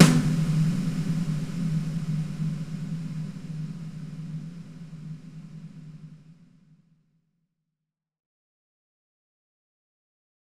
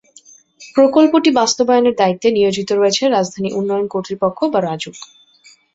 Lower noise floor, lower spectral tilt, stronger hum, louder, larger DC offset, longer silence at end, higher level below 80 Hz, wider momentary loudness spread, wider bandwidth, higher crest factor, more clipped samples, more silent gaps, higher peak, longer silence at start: first, -87 dBFS vs -49 dBFS; first, -6 dB/octave vs -4.5 dB/octave; neither; second, -28 LUFS vs -15 LUFS; first, 0.3% vs under 0.1%; first, 2.3 s vs 0.7 s; about the same, -54 dBFS vs -58 dBFS; first, 19 LU vs 10 LU; first, 13.5 kHz vs 8 kHz; first, 28 dB vs 14 dB; neither; neither; about the same, 0 dBFS vs -2 dBFS; second, 0 s vs 0.6 s